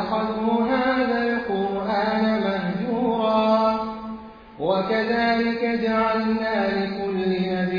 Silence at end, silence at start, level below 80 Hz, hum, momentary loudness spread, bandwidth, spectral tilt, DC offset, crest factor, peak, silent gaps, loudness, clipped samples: 0 s; 0 s; -52 dBFS; none; 5 LU; 5.2 kHz; -8 dB/octave; under 0.1%; 14 dB; -8 dBFS; none; -22 LUFS; under 0.1%